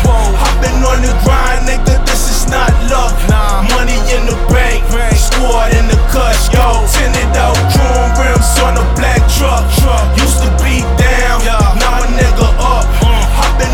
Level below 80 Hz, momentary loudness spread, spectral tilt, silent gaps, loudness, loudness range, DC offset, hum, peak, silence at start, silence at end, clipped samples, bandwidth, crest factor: -10 dBFS; 2 LU; -4.5 dB/octave; none; -11 LUFS; 2 LU; under 0.1%; none; 0 dBFS; 0 s; 0 s; under 0.1%; 18 kHz; 8 dB